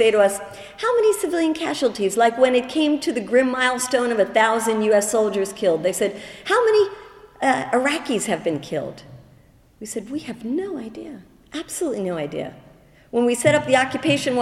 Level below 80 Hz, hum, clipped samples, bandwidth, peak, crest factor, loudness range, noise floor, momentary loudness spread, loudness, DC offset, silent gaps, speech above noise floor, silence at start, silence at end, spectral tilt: -58 dBFS; none; under 0.1%; 14 kHz; -2 dBFS; 18 dB; 10 LU; -52 dBFS; 14 LU; -20 LUFS; under 0.1%; none; 32 dB; 0 s; 0 s; -4 dB/octave